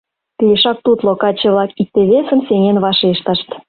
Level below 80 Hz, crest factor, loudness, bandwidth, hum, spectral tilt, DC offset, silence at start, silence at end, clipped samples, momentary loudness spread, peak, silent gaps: -54 dBFS; 12 dB; -13 LUFS; 4.8 kHz; none; -11 dB/octave; under 0.1%; 0.4 s; 0.1 s; under 0.1%; 5 LU; -2 dBFS; none